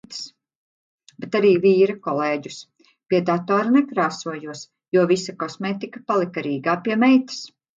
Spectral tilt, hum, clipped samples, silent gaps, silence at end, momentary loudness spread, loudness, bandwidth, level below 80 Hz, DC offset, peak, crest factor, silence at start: -6 dB/octave; none; under 0.1%; 0.55-0.98 s, 4.88-4.92 s; 0.3 s; 17 LU; -21 LUFS; 7.8 kHz; -70 dBFS; under 0.1%; -6 dBFS; 16 dB; 0.1 s